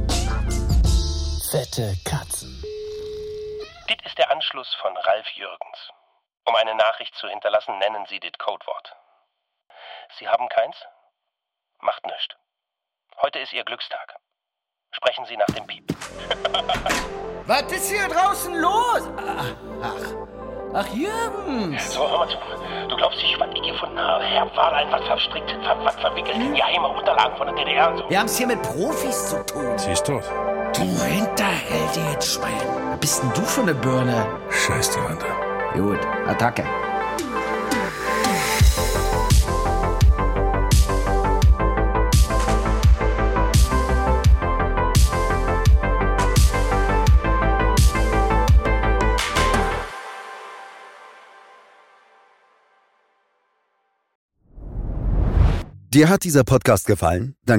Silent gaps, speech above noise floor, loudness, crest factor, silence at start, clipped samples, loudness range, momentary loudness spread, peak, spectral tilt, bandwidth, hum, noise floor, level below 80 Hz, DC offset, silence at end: 54.15-54.29 s; 62 dB; -21 LUFS; 18 dB; 0 s; under 0.1%; 9 LU; 13 LU; -2 dBFS; -4.5 dB/octave; 16.5 kHz; none; -84 dBFS; -26 dBFS; under 0.1%; 0 s